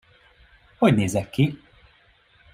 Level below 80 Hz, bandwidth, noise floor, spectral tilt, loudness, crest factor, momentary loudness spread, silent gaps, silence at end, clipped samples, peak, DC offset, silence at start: -54 dBFS; 15.5 kHz; -58 dBFS; -6.5 dB/octave; -22 LUFS; 20 dB; 6 LU; none; 1 s; under 0.1%; -4 dBFS; under 0.1%; 0.8 s